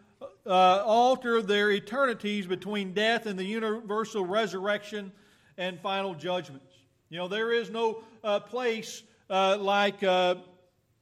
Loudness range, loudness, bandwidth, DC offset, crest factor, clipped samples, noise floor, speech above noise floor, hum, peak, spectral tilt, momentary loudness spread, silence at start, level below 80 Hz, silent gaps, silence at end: 7 LU; -28 LUFS; 14 kHz; under 0.1%; 18 dB; under 0.1%; -64 dBFS; 36 dB; none; -10 dBFS; -4.5 dB/octave; 13 LU; 0.2 s; -76 dBFS; none; 0.6 s